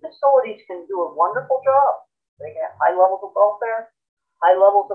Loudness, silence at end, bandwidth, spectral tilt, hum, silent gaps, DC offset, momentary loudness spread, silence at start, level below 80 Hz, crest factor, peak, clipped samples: -18 LUFS; 0 s; 4.4 kHz; -7 dB/octave; none; 2.28-2.37 s, 4.09-4.17 s; under 0.1%; 15 LU; 0 s; -78 dBFS; 16 dB; -2 dBFS; under 0.1%